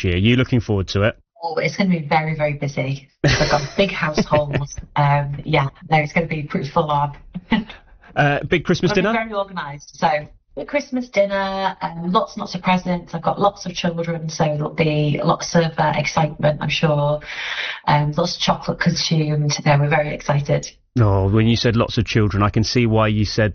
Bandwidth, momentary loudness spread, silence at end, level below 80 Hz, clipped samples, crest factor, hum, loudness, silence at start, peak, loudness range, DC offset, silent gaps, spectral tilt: 6.8 kHz; 8 LU; 0 s; -40 dBFS; under 0.1%; 14 dB; none; -19 LUFS; 0 s; -4 dBFS; 3 LU; under 0.1%; none; -5 dB/octave